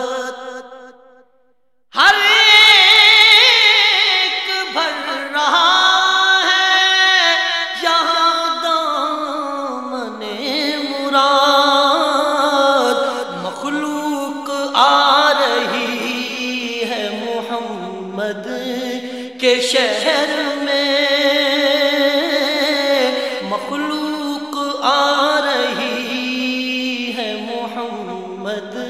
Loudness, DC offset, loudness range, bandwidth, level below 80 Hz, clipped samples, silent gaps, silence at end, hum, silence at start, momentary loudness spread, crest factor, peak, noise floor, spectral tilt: -14 LUFS; 0.2%; 10 LU; 16.5 kHz; -68 dBFS; under 0.1%; none; 0 s; none; 0 s; 15 LU; 16 dB; 0 dBFS; -64 dBFS; -1.5 dB/octave